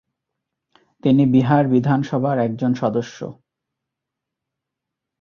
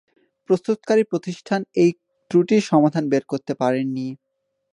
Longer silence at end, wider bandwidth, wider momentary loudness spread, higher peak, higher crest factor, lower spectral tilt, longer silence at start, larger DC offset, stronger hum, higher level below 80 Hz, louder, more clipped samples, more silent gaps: first, 1.9 s vs 0.6 s; second, 6.8 kHz vs 10.5 kHz; first, 13 LU vs 9 LU; about the same, -2 dBFS vs -4 dBFS; about the same, 18 dB vs 18 dB; first, -8.5 dB/octave vs -7 dB/octave; first, 1.05 s vs 0.5 s; neither; neither; first, -58 dBFS vs -70 dBFS; first, -18 LUFS vs -21 LUFS; neither; neither